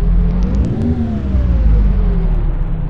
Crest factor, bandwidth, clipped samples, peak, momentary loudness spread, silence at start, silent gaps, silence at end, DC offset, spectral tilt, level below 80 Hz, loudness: 10 dB; 4.1 kHz; under 0.1%; -2 dBFS; 4 LU; 0 s; none; 0 s; 3%; -10 dB/octave; -14 dBFS; -16 LUFS